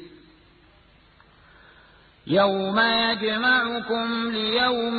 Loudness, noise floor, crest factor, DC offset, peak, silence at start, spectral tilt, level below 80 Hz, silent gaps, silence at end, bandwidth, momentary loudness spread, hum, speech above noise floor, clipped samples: -22 LUFS; -56 dBFS; 16 dB; under 0.1%; -8 dBFS; 0 s; -9 dB/octave; -58 dBFS; none; 0 s; 4.8 kHz; 6 LU; none; 33 dB; under 0.1%